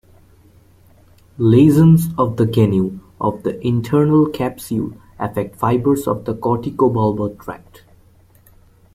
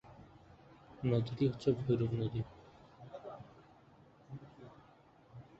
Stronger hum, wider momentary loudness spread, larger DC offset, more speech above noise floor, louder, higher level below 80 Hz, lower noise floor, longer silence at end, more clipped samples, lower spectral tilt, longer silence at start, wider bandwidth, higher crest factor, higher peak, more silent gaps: neither; second, 13 LU vs 25 LU; neither; first, 34 dB vs 29 dB; first, -17 LUFS vs -36 LUFS; first, -46 dBFS vs -64 dBFS; second, -50 dBFS vs -63 dBFS; first, 1.35 s vs 0.15 s; neither; about the same, -8.5 dB/octave vs -8.5 dB/octave; first, 1.4 s vs 0.05 s; first, 15.5 kHz vs 7.8 kHz; about the same, 16 dB vs 20 dB; first, -2 dBFS vs -18 dBFS; neither